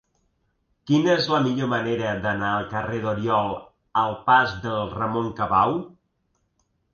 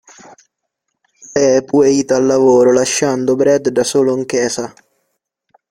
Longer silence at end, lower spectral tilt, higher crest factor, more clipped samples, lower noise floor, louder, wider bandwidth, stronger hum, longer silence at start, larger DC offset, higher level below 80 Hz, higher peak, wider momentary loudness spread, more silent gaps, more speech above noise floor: about the same, 1.05 s vs 1 s; first, -6.5 dB/octave vs -4.5 dB/octave; first, 20 dB vs 14 dB; neither; about the same, -71 dBFS vs -74 dBFS; second, -23 LUFS vs -13 LUFS; second, 7 kHz vs 15 kHz; neither; second, 0.85 s vs 1.3 s; neither; about the same, -52 dBFS vs -56 dBFS; second, -6 dBFS vs -2 dBFS; about the same, 9 LU vs 8 LU; neither; second, 49 dB vs 61 dB